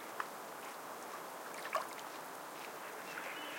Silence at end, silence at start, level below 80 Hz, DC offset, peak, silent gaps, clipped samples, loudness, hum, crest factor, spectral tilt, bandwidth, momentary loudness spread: 0 s; 0 s; under -90 dBFS; under 0.1%; -24 dBFS; none; under 0.1%; -45 LUFS; none; 22 dB; -1.5 dB/octave; 17 kHz; 6 LU